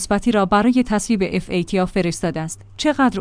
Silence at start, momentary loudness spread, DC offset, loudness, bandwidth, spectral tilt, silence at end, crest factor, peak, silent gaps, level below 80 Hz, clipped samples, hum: 0 s; 8 LU; under 0.1%; -19 LUFS; 10.5 kHz; -5.5 dB/octave; 0 s; 14 dB; -4 dBFS; none; -40 dBFS; under 0.1%; none